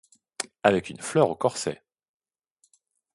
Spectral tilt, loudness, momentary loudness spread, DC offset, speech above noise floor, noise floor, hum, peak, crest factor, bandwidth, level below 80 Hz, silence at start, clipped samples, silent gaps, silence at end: -4.5 dB/octave; -26 LUFS; 13 LU; under 0.1%; 46 dB; -70 dBFS; none; -4 dBFS; 24 dB; 11.5 kHz; -64 dBFS; 0.4 s; under 0.1%; none; 1.4 s